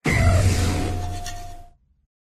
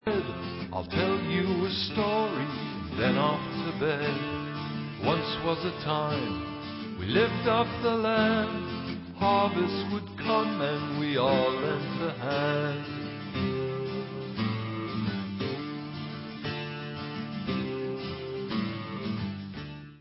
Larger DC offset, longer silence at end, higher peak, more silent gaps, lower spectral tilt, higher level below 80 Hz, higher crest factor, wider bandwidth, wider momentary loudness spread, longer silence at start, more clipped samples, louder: neither; first, 0.6 s vs 0 s; first, -6 dBFS vs -12 dBFS; neither; second, -5.5 dB/octave vs -10 dB/octave; first, -30 dBFS vs -52 dBFS; about the same, 16 dB vs 18 dB; first, 14.5 kHz vs 5.8 kHz; first, 19 LU vs 11 LU; about the same, 0.05 s vs 0.05 s; neither; first, -22 LUFS vs -30 LUFS